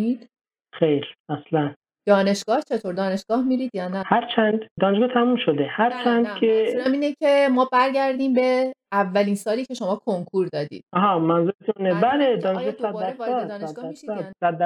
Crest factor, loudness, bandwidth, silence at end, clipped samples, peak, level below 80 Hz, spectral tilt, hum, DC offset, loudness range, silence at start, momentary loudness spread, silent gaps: 16 dB; -22 LUFS; 13.5 kHz; 0 s; under 0.1%; -4 dBFS; -70 dBFS; -6 dB/octave; none; under 0.1%; 3 LU; 0 s; 9 LU; 1.20-1.25 s, 1.76-1.81 s, 4.71-4.76 s, 11.55-11.59 s